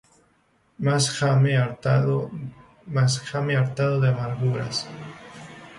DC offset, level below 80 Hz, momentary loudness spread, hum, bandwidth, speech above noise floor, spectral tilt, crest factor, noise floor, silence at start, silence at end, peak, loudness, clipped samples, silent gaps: under 0.1%; -58 dBFS; 19 LU; none; 11.5 kHz; 41 dB; -5.5 dB/octave; 16 dB; -64 dBFS; 0.8 s; 0 s; -8 dBFS; -23 LUFS; under 0.1%; none